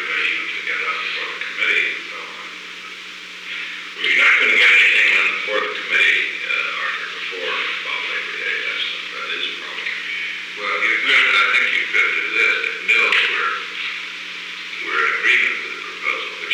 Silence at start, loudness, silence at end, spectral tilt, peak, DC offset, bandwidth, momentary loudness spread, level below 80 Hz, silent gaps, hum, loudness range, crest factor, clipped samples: 0 s; -17 LUFS; 0 s; 0 dB/octave; -6 dBFS; under 0.1%; 15 kHz; 15 LU; -74 dBFS; none; none; 8 LU; 14 dB; under 0.1%